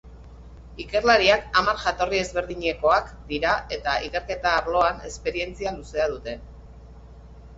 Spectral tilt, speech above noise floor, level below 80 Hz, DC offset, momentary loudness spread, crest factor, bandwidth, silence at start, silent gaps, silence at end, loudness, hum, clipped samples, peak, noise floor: -3.5 dB/octave; 21 dB; -42 dBFS; under 0.1%; 13 LU; 20 dB; 8 kHz; 0.05 s; none; 0 s; -23 LUFS; none; under 0.1%; -4 dBFS; -44 dBFS